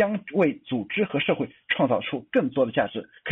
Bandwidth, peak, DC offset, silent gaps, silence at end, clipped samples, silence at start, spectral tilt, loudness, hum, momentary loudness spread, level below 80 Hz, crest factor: 4 kHz; -10 dBFS; under 0.1%; none; 0 s; under 0.1%; 0 s; -4 dB/octave; -25 LUFS; none; 6 LU; -66 dBFS; 16 dB